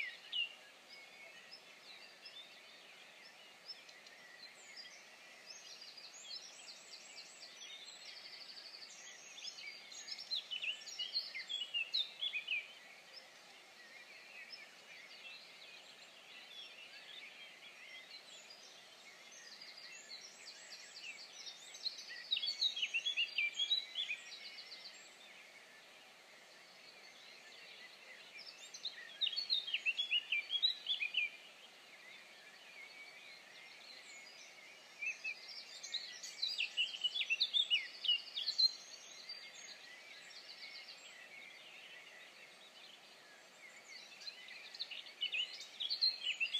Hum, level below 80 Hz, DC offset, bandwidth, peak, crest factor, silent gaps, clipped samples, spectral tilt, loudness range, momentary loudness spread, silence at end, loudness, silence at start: none; under -90 dBFS; under 0.1%; 15.5 kHz; -22 dBFS; 24 dB; none; under 0.1%; 2 dB/octave; 17 LU; 21 LU; 0 s; -40 LUFS; 0 s